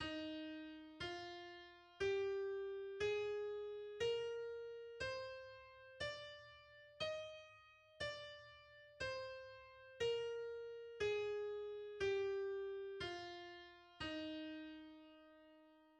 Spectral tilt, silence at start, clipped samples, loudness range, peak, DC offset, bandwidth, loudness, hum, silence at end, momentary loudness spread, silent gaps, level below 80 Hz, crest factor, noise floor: -4 dB/octave; 0 s; under 0.1%; 6 LU; -32 dBFS; under 0.1%; 9.4 kHz; -46 LUFS; none; 0 s; 19 LU; none; -72 dBFS; 16 dB; -68 dBFS